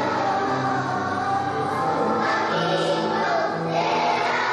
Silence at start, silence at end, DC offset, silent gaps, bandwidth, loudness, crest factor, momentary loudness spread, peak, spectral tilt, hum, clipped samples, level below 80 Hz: 0 s; 0 s; under 0.1%; none; 12 kHz; -23 LUFS; 12 dB; 3 LU; -10 dBFS; -5 dB/octave; none; under 0.1%; -64 dBFS